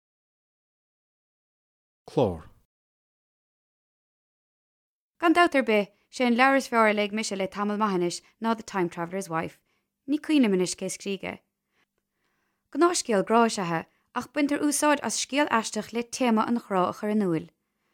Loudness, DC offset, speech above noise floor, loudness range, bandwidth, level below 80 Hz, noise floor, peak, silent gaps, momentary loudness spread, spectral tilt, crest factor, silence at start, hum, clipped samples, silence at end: -26 LUFS; under 0.1%; 51 dB; 11 LU; 16.5 kHz; -66 dBFS; -77 dBFS; -6 dBFS; 2.65-5.14 s; 11 LU; -4 dB/octave; 20 dB; 2.1 s; none; under 0.1%; 0.45 s